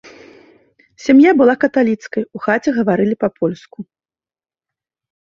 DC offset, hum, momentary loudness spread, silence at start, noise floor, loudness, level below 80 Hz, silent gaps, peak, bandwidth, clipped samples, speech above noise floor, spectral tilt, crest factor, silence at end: under 0.1%; none; 15 LU; 1 s; under -90 dBFS; -15 LUFS; -58 dBFS; none; -2 dBFS; 7.2 kHz; under 0.1%; over 76 dB; -7 dB/octave; 16 dB; 1.35 s